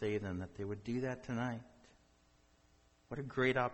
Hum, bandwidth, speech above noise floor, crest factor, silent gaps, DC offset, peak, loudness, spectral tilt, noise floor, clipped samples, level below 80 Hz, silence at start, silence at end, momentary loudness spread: none; 8.4 kHz; 32 dB; 20 dB; none; under 0.1%; -20 dBFS; -40 LUFS; -7 dB/octave; -70 dBFS; under 0.1%; -66 dBFS; 0 s; 0 s; 12 LU